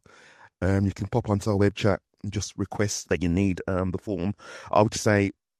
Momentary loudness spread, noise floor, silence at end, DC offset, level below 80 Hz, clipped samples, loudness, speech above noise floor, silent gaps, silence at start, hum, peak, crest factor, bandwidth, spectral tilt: 9 LU; -53 dBFS; 0.3 s; under 0.1%; -52 dBFS; under 0.1%; -26 LUFS; 28 dB; none; 0.45 s; none; -4 dBFS; 20 dB; 13.5 kHz; -6 dB/octave